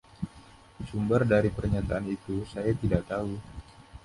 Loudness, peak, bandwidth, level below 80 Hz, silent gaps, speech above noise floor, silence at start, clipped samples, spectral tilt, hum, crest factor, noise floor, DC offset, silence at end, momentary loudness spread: -29 LUFS; -8 dBFS; 11.5 kHz; -44 dBFS; none; 25 dB; 0.2 s; under 0.1%; -8.5 dB/octave; none; 22 dB; -53 dBFS; under 0.1%; 0.05 s; 16 LU